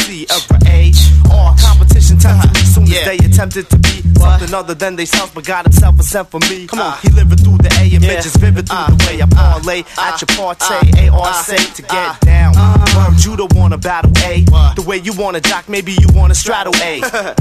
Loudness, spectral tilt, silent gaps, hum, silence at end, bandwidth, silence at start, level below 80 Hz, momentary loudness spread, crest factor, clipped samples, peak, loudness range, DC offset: -10 LUFS; -5 dB/octave; none; none; 0 s; 14.5 kHz; 0 s; -12 dBFS; 9 LU; 8 dB; 0.2%; 0 dBFS; 4 LU; under 0.1%